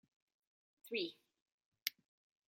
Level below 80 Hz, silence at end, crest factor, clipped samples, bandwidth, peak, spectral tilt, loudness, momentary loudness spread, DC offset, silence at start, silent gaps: under -90 dBFS; 0.55 s; 36 dB; under 0.1%; 16 kHz; -14 dBFS; -1.5 dB/octave; -44 LUFS; 6 LU; under 0.1%; 0.85 s; 1.42-1.46 s, 1.52-1.58 s, 1.66-1.72 s, 1.82-1.86 s